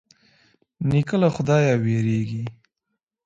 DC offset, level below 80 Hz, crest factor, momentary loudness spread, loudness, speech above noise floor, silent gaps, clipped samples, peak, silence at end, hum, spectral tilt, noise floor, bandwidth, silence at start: under 0.1%; -54 dBFS; 18 dB; 11 LU; -22 LUFS; 60 dB; none; under 0.1%; -6 dBFS; 0.75 s; none; -7.5 dB/octave; -80 dBFS; 7.8 kHz; 0.8 s